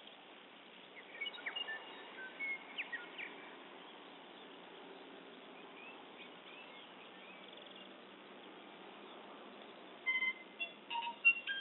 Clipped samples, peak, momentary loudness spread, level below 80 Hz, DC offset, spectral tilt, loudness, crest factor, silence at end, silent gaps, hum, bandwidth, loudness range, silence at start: under 0.1%; -20 dBFS; 18 LU; under -90 dBFS; under 0.1%; 1.5 dB/octave; -40 LUFS; 26 dB; 0 s; none; none; 4 kHz; 11 LU; 0 s